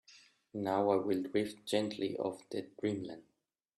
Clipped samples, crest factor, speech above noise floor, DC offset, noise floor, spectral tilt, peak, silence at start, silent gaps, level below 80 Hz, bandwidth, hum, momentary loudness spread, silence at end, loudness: under 0.1%; 20 dB; 28 dB; under 0.1%; -63 dBFS; -5.5 dB/octave; -16 dBFS; 0.1 s; none; -78 dBFS; 13 kHz; none; 12 LU; 0.55 s; -36 LUFS